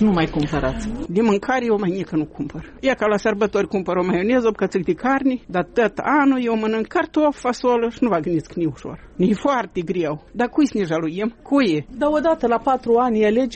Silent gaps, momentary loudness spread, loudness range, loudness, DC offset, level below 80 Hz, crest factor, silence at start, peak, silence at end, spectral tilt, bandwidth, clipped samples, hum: none; 7 LU; 2 LU; -20 LUFS; under 0.1%; -42 dBFS; 12 dB; 0 s; -6 dBFS; 0 s; -6.5 dB/octave; 8.4 kHz; under 0.1%; none